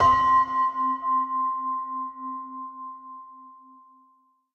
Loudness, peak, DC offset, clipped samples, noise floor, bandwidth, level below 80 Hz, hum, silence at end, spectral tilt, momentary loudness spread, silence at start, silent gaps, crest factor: -25 LUFS; -10 dBFS; under 0.1%; under 0.1%; -63 dBFS; 6.8 kHz; -54 dBFS; none; 1 s; -5 dB/octave; 21 LU; 0 s; none; 16 dB